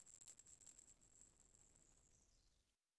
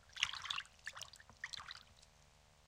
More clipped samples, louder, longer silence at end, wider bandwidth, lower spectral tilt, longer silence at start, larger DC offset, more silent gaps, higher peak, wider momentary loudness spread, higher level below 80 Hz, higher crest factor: neither; second, -65 LUFS vs -45 LUFS; first, 0.25 s vs 0 s; second, 11 kHz vs 16.5 kHz; first, -1 dB/octave vs 1 dB/octave; about the same, 0 s vs 0 s; neither; neither; second, -46 dBFS vs -16 dBFS; second, 7 LU vs 24 LU; second, -82 dBFS vs -72 dBFS; second, 24 dB vs 32 dB